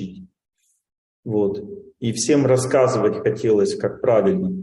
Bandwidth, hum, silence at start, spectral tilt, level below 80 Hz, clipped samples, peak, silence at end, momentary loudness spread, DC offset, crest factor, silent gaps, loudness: 12 kHz; none; 0 s; -5.5 dB/octave; -60 dBFS; under 0.1%; -4 dBFS; 0 s; 14 LU; under 0.1%; 16 dB; 0.98-1.23 s; -19 LUFS